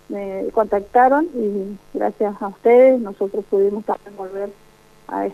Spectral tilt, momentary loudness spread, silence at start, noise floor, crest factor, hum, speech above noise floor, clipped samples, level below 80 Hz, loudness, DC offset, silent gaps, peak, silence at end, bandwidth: -8 dB/octave; 16 LU; 0.1 s; -44 dBFS; 16 dB; none; 26 dB; under 0.1%; -54 dBFS; -19 LUFS; under 0.1%; none; -2 dBFS; 0 s; 6.2 kHz